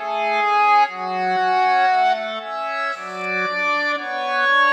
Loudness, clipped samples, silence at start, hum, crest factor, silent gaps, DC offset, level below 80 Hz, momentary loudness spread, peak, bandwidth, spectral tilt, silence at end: -19 LUFS; under 0.1%; 0 s; none; 14 dB; none; under 0.1%; -88 dBFS; 9 LU; -6 dBFS; 8.8 kHz; -3 dB/octave; 0 s